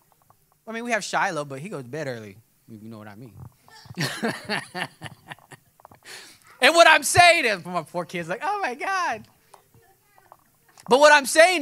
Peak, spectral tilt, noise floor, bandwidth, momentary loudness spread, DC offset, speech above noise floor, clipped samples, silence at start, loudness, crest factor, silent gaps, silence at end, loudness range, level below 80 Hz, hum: 0 dBFS; -2.5 dB/octave; -61 dBFS; 16 kHz; 27 LU; under 0.1%; 39 dB; under 0.1%; 0.65 s; -20 LUFS; 22 dB; none; 0 s; 13 LU; -64 dBFS; none